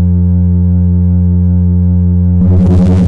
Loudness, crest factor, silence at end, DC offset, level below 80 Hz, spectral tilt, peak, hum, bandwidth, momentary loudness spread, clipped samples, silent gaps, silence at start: -9 LUFS; 6 dB; 0 s; under 0.1%; -26 dBFS; -11 dB/octave; 0 dBFS; none; 2.4 kHz; 2 LU; under 0.1%; none; 0 s